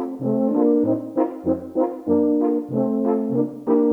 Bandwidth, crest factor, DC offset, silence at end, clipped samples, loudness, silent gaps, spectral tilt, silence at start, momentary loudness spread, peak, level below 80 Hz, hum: 2.7 kHz; 14 dB; under 0.1%; 0 s; under 0.1%; -21 LUFS; none; -11 dB/octave; 0 s; 5 LU; -6 dBFS; -62 dBFS; none